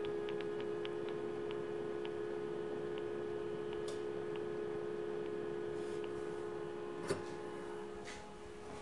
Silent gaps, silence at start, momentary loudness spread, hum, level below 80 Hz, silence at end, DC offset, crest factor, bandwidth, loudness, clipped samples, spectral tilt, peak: none; 0 s; 5 LU; none; -70 dBFS; 0 s; 0.2%; 18 dB; 11.5 kHz; -43 LUFS; under 0.1%; -5.5 dB/octave; -24 dBFS